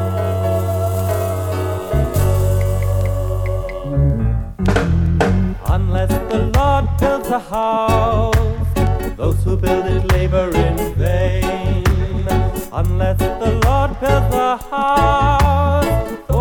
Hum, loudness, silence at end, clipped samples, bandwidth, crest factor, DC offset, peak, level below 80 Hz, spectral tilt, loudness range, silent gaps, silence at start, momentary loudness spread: none; -17 LUFS; 0 s; under 0.1%; 18.5 kHz; 16 dB; under 0.1%; 0 dBFS; -22 dBFS; -7 dB/octave; 2 LU; none; 0 s; 5 LU